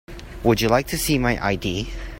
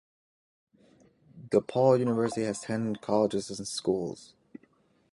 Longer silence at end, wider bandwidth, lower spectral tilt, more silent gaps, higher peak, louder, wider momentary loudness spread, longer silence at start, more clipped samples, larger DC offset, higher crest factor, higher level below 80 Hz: second, 0 s vs 0.9 s; first, 16.5 kHz vs 11.5 kHz; about the same, -5 dB/octave vs -6 dB/octave; neither; first, -2 dBFS vs -10 dBFS; first, -21 LUFS vs -29 LUFS; about the same, 9 LU vs 10 LU; second, 0.1 s vs 1.35 s; neither; neither; about the same, 20 dB vs 20 dB; first, -34 dBFS vs -66 dBFS